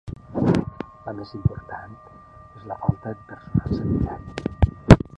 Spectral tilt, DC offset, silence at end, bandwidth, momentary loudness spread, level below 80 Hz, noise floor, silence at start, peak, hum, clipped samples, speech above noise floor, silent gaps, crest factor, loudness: -8 dB/octave; under 0.1%; 0.2 s; 10 kHz; 16 LU; -32 dBFS; -45 dBFS; 0.05 s; 0 dBFS; none; under 0.1%; 19 dB; none; 22 dB; -24 LUFS